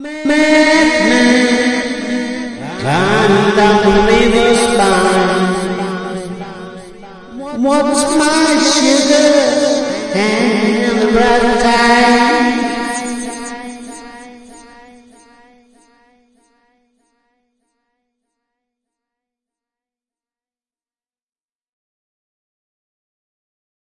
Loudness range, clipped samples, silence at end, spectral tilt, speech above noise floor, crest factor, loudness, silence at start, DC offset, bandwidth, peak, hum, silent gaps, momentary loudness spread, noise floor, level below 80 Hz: 6 LU; under 0.1%; 9.3 s; -4 dB/octave; over 80 dB; 14 dB; -12 LUFS; 0 s; under 0.1%; 11.5 kHz; 0 dBFS; none; none; 16 LU; under -90 dBFS; -38 dBFS